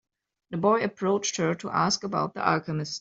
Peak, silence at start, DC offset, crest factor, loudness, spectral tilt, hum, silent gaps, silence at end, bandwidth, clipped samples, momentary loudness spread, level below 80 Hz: -6 dBFS; 0.5 s; under 0.1%; 20 dB; -26 LUFS; -4.5 dB/octave; none; none; 0 s; 8 kHz; under 0.1%; 5 LU; -66 dBFS